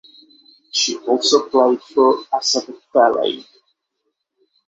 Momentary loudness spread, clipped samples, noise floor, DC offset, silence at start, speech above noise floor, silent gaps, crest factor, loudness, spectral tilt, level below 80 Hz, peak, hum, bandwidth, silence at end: 7 LU; under 0.1%; -74 dBFS; under 0.1%; 0.75 s; 57 dB; none; 18 dB; -17 LUFS; -1.5 dB/octave; -68 dBFS; -2 dBFS; none; 8.2 kHz; 1.25 s